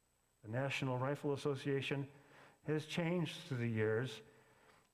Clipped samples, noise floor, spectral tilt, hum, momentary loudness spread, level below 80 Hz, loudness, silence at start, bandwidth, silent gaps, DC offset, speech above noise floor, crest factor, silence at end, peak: under 0.1%; -68 dBFS; -6.5 dB/octave; none; 10 LU; -76 dBFS; -40 LUFS; 0.45 s; 15 kHz; none; under 0.1%; 29 dB; 16 dB; 0.7 s; -24 dBFS